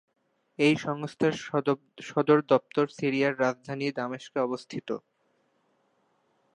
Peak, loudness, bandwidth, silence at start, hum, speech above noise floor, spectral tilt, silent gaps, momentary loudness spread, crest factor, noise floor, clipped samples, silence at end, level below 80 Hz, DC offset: -8 dBFS; -28 LUFS; 10.5 kHz; 0.6 s; none; 44 dB; -6 dB/octave; none; 12 LU; 22 dB; -71 dBFS; under 0.1%; 1.55 s; -74 dBFS; under 0.1%